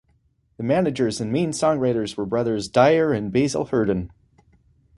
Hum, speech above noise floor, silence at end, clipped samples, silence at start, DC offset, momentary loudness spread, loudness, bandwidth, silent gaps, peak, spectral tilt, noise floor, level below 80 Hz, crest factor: none; 43 dB; 0.95 s; under 0.1%; 0.6 s; under 0.1%; 8 LU; -22 LUFS; 11.5 kHz; none; -2 dBFS; -6 dB/octave; -64 dBFS; -50 dBFS; 20 dB